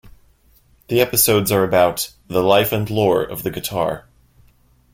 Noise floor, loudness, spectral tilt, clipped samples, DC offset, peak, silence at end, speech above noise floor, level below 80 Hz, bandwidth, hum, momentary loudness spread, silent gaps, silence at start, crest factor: -55 dBFS; -18 LUFS; -4 dB/octave; under 0.1%; under 0.1%; -2 dBFS; 0.95 s; 37 dB; -48 dBFS; 16.5 kHz; none; 10 LU; none; 0.05 s; 18 dB